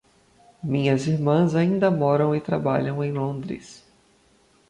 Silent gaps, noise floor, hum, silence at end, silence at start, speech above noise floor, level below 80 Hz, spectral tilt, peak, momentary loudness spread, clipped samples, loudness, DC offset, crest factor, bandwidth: none; -60 dBFS; none; 0.95 s; 0.65 s; 38 dB; -60 dBFS; -8 dB/octave; -8 dBFS; 12 LU; under 0.1%; -22 LUFS; under 0.1%; 16 dB; 10.5 kHz